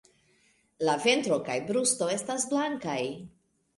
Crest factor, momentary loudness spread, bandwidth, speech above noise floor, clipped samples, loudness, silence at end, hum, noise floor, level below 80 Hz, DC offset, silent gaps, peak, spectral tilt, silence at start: 20 dB; 8 LU; 11.5 kHz; 39 dB; under 0.1%; -28 LUFS; 0.5 s; none; -67 dBFS; -72 dBFS; under 0.1%; none; -10 dBFS; -3 dB/octave; 0.8 s